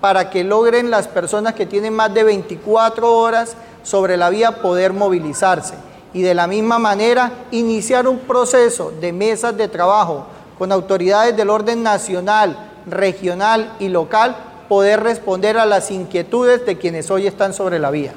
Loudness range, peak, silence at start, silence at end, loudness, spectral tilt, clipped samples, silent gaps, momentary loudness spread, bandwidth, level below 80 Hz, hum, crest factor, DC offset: 1 LU; -4 dBFS; 0 s; 0 s; -16 LUFS; -4 dB/octave; under 0.1%; none; 7 LU; 15 kHz; -56 dBFS; none; 12 dB; under 0.1%